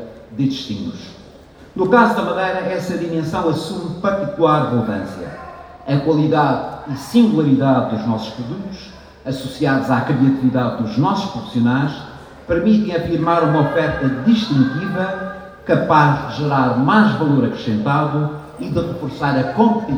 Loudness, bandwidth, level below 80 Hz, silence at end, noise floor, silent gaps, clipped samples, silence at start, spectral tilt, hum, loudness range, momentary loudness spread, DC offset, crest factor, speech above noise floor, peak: -17 LUFS; 13 kHz; -46 dBFS; 0 s; -42 dBFS; none; under 0.1%; 0 s; -7.5 dB/octave; none; 3 LU; 15 LU; under 0.1%; 16 dB; 25 dB; 0 dBFS